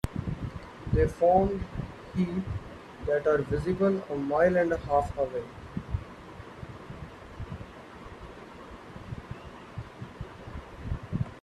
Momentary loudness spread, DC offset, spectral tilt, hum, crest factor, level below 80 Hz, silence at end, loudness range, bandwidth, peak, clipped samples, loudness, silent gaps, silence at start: 21 LU; under 0.1%; -8 dB/octave; none; 20 dB; -44 dBFS; 0 s; 16 LU; 12.5 kHz; -10 dBFS; under 0.1%; -29 LUFS; none; 0.05 s